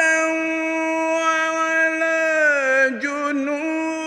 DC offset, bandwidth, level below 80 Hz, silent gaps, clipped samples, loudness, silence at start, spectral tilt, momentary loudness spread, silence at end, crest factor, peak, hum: under 0.1%; 12 kHz; -70 dBFS; none; under 0.1%; -19 LUFS; 0 s; -2 dB/octave; 6 LU; 0 s; 14 dB; -6 dBFS; none